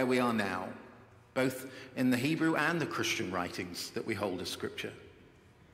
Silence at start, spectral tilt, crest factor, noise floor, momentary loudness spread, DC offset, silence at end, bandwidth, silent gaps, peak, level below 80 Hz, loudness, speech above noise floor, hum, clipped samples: 0 s; -4.5 dB/octave; 20 dB; -59 dBFS; 14 LU; under 0.1%; 0.45 s; 16 kHz; none; -14 dBFS; -70 dBFS; -33 LUFS; 26 dB; none; under 0.1%